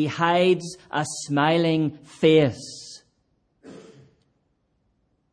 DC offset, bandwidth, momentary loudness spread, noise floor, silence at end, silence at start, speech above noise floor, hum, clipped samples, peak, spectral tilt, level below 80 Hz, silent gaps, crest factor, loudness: under 0.1%; 10.5 kHz; 18 LU; -70 dBFS; 1.5 s; 0 s; 48 dB; none; under 0.1%; -6 dBFS; -5.5 dB/octave; -66 dBFS; none; 18 dB; -22 LUFS